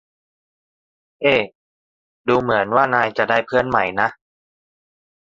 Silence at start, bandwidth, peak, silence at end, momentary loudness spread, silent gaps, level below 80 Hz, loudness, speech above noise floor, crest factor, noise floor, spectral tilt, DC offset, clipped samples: 1.2 s; 7.6 kHz; -2 dBFS; 1.1 s; 6 LU; 1.55-2.24 s; -56 dBFS; -18 LUFS; over 72 dB; 20 dB; under -90 dBFS; -6.5 dB/octave; under 0.1%; under 0.1%